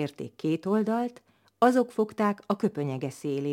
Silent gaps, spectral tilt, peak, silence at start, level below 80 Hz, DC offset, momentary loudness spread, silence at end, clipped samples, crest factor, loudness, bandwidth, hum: none; -7 dB/octave; -8 dBFS; 0 s; -76 dBFS; under 0.1%; 10 LU; 0 s; under 0.1%; 20 dB; -28 LUFS; 16.5 kHz; none